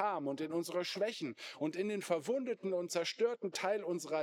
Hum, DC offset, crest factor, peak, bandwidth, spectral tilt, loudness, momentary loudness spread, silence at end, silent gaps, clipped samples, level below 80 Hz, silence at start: none; under 0.1%; 16 dB; -20 dBFS; 17.5 kHz; -4 dB/octave; -37 LUFS; 3 LU; 0 s; none; under 0.1%; under -90 dBFS; 0 s